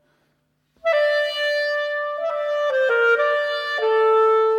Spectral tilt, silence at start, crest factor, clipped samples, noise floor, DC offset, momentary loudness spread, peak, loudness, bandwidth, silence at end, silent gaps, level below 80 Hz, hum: -0.5 dB/octave; 0.85 s; 12 dB; under 0.1%; -68 dBFS; under 0.1%; 8 LU; -8 dBFS; -20 LUFS; 9.6 kHz; 0 s; none; -76 dBFS; none